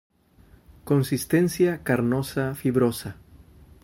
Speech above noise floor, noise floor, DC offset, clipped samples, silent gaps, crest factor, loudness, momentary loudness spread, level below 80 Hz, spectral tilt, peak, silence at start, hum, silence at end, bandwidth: 32 dB; -55 dBFS; under 0.1%; under 0.1%; none; 16 dB; -24 LUFS; 5 LU; -52 dBFS; -6.5 dB/octave; -8 dBFS; 0.85 s; none; 0.7 s; 16.5 kHz